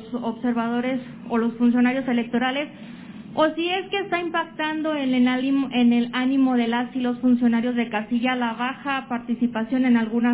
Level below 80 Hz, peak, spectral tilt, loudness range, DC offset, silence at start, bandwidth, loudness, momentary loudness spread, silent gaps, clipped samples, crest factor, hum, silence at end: -64 dBFS; -8 dBFS; -3 dB/octave; 3 LU; under 0.1%; 0 s; 4 kHz; -23 LUFS; 8 LU; none; under 0.1%; 16 dB; none; 0 s